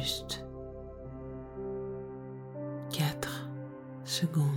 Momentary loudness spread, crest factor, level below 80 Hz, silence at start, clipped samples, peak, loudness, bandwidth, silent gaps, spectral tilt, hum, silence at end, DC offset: 12 LU; 20 dB; -54 dBFS; 0 s; under 0.1%; -16 dBFS; -37 LUFS; 17.5 kHz; none; -5 dB/octave; none; 0 s; under 0.1%